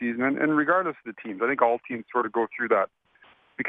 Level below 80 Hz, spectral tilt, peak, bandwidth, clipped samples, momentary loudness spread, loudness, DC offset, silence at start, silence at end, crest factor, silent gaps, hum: -74 dBFS; -9 dB/octave; -8 dBFS; 3.9 kHz; under 0.1%; 10 LU; -25 LUFS; under 0.1%; 0 s; 0 s; 18 dB; none; none